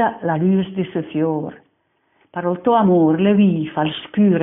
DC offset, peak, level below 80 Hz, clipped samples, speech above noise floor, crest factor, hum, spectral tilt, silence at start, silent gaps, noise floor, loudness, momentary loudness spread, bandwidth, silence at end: under 0.1%; -4 dBFS; -56 dBFS; under 0.1%; 48 dB; 14 dB; none; -6 dB/octave; 0 s; none; -65 dBFS; -18 LUFS; 10 LU; 3.9 kHz; 0 s